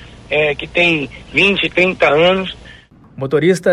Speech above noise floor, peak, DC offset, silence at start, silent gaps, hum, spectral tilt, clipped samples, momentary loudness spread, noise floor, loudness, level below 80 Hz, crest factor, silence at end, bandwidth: 27 dB; 0 dBFS; under 0.1%; 0 s; none; none; -5 dB/octave; under 0.1%; 8 LU; -41 dBFS; -14 LUFS; -42 dBFS; 14 dB; 0 s; 12.5 kHz